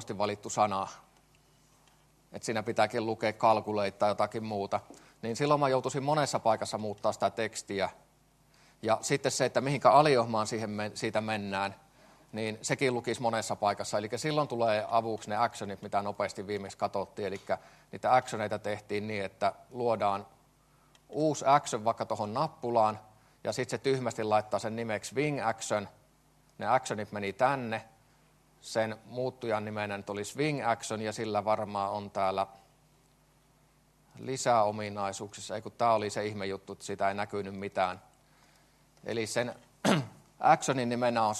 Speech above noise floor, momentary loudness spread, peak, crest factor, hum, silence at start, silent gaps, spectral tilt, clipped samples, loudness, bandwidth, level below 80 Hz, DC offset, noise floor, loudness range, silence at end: 35 dB; 11 LU; -8 dBFS; 24 dB; none; 0 s; none; -4.5 dB/octave; under 0.1%; -31 LUFS; 13 kHz; -72 dBFS; under 0.1%; -65 dBFS; 6 LU; 0 s